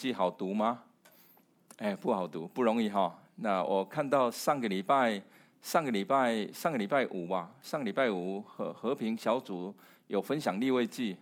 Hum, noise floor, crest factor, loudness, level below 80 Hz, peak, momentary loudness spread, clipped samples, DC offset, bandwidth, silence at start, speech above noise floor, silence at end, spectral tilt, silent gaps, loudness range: none; -64 dBFS; 18 dB; -32 LUFS; -88 dBFS; -14 dBFS; 10 LU; under 0.1%; under 0.1%; 20 kHz; 0 s; 32 dB; 0.05 s; -5.5 dB/octave; none; 4 LU